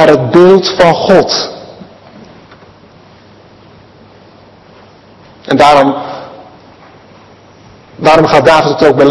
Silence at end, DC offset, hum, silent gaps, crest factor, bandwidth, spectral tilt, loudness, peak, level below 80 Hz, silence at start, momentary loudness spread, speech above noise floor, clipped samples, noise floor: 0 s; under 0.1%; none; none; 10 dB; 12 kHz; -5.5 dB/octave; -7 LUFS; 0 dBFS; -42 dBFS; 0 s; 17 LU; 33 dB; 3%; -39 dBFS